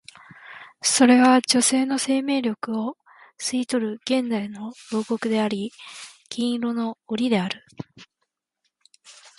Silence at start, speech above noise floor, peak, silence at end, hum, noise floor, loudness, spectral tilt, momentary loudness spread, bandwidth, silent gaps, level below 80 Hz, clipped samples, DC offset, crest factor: 0.45 s; 56 dB; -6 dBFS; 0.25 s; none; -78 dBFS; -22 LUFS; -3 dB/octave; 22 LU; 11.5 kHz; none; -70 dBFS; under 0.1%; under 0.1%; 18 dB